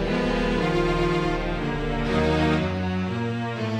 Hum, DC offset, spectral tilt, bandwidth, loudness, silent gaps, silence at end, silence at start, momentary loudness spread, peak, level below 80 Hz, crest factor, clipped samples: none; under 0.1%; -7 dB/octave; 11 kHz; -24 LUFS; none; 0 s; 0 s; 5 LU; -10 dBFS; -34 dBFS; 14 dB; under 0.1%